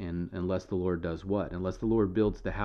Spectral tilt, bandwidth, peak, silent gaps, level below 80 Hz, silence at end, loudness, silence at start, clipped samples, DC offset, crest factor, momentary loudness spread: -8.5 dB/octave; 7 kHz; -16 dBFS; none; -46 dBFS; 0 s; -31 LUFS; 0 s; under 0.1%; under 0.1%; 14 dB; 6 LU